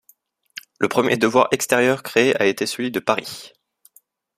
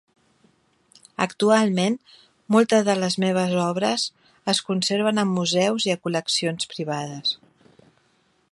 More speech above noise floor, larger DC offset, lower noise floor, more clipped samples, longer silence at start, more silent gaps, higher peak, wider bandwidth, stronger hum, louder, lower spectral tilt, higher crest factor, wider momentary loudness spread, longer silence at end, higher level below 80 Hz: second, 39 dB vs 43 dB; neither; second, -58 dBFS vs -64 dBFS; neither; second, 0.8 s vs 1.2 s; neither; first, 0 dBFS vs -4 dBFS; first, 15.5 kHz vs 11.5 kHz; neither; first, -19 LUFS vs -22 LUFS; about the same, -4 dB/octave vs -4.5 dB/octave; about the same, 20 dB vs 20 dB; first, 19 LU vs 10 LU; second, 0.9 s vs 1.15 s; first, -62 dBFS vs -70 dBFS